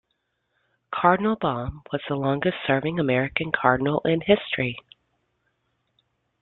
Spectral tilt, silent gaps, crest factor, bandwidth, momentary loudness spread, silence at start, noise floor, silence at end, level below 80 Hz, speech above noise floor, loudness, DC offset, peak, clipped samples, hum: -10 dB/octave; none; 22 dB; 4.3 kHz; 10 LU; 0.9 s; -75 dBFS; 1.6 s; -52 dBFS; 52 dB; -24 LUFS; under 0.1%; -2 dBFS; under 0.1%; none